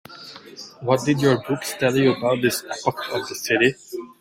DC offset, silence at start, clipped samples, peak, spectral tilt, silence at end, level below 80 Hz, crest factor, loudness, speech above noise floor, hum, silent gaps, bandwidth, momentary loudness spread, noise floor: under 0.1%; 0.1 s; under 0.1%; -4 dBFS; -5 dB/octave; 0.15 s; -60 dBFS; 18 dB; -21 LUFS; 20 dB; none; none; 16.5 kHz; 19 LU; -41 dBFS